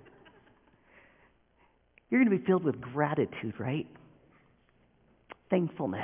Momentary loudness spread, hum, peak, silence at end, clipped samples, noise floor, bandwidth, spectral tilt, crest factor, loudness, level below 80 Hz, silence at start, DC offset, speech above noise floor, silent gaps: 14 LU; none; -12 dBFS; 0 s; under 0.1%; -67 dBFS; 3.6 kHz; -7 dB/octave; 20 dB; -30 LUFS; -68 dBFS; 2.1 s; under 0.1%; 38 dB; none